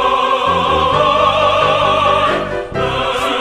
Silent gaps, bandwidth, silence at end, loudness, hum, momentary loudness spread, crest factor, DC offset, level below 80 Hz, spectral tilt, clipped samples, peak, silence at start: none; 14 kHz; 0 s; -13 LUFS; none; 6 LU; 12 dB; under 0.1%; -36 dBFS; -4.5 dB/octave; under 0.1%; -2 dBFS; 0 s